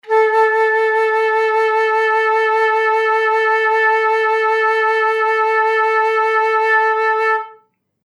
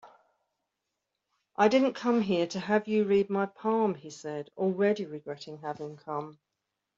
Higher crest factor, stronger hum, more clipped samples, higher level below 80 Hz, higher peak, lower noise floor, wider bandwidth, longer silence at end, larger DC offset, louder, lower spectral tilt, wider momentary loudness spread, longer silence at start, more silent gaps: second, 12 dB vs 20 dB; neither; neither; second, -90 dBFS vs -74 dBFS; first, -4 dBFS vs -10 dBFS; second, -52 dBFS vs -85 dBFS; first, 11.5 kHz vs 7.6 kHz; about the same, 0.55 s vs 0.65 s; neither; first, -14 LUFS vs -29 LUFS; second, 0 dB/octave vs -6 dB/octave; second, 2 LU vs 14 LU; about the same, 0.05 s vs 0.05 s; neither